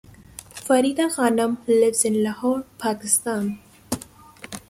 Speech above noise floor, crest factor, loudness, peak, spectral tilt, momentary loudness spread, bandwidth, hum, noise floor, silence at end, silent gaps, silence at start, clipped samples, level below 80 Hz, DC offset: 23 dB; 20 dB; -22 LUFS; -4 dBFS; -3.5 dB/octave; 19 LU; 16 kHz; none; -44 dBFS; 0.1 s; none; 0.55 s; under 0.1%; -58 dBFS; under 0.1%